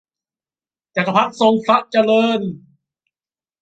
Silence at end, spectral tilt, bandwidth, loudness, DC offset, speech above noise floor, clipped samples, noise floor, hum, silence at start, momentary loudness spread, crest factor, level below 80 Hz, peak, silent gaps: 1.05 s; -6 dB/octave; 8.8 kHz; -16 LUFS; under 0.1%; over 74 dB; under 0.1%; under -90 dBFS; none; 0.95 s; 9 LU; 18 dB; -64 dBFS; -2 dBFS; none